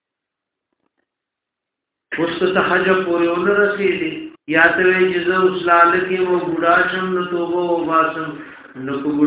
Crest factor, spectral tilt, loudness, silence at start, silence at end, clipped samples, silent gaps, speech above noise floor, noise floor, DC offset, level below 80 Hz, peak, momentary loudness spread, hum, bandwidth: 18 dB; -9 dB/octave; -16 LUFS; 2.1 s; 0 s; under 0.1%; none; 66 dB; -82 dBFS; under 0.1%; -56 dBFS; 0 dBFS; 14 LU; none; 4 kHz